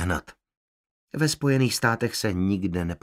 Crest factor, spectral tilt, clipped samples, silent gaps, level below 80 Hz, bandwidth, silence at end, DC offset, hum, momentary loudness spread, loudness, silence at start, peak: 20 dB; -5 dB/octave; under 0.1%; 0.57-1.08 s; -48 dBFS; 16 kHz; 0.05 s; under 0.1%; none; 7 LU; -25 LUFS; 0 s; -6 dBFS